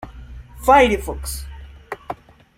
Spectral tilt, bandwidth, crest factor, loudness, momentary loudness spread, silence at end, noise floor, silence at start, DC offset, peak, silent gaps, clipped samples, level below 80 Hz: -4.5 dB/octave; 16.5 kHz; 20 dB; -17 LUFS; 24 LU; 0.45 s; -38 dBFS; 0 s; under 0.1%; -2 dBFS; none; under 0.1%; -34 dBFS